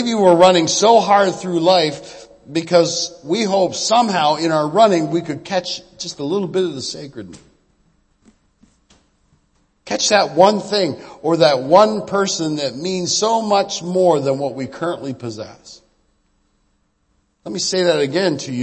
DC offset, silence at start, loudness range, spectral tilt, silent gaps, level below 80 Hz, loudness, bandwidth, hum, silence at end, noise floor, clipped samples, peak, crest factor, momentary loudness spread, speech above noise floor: under 0.1%; 0 s; 11 LU; -4 dB/octave; none; -60 dBFS; -16 LUFS; 8.8 kHz; none; 0 s; -64 dBFS; under 0.1%; 0 dBFS; 18 dB; 14 LU; 47 dB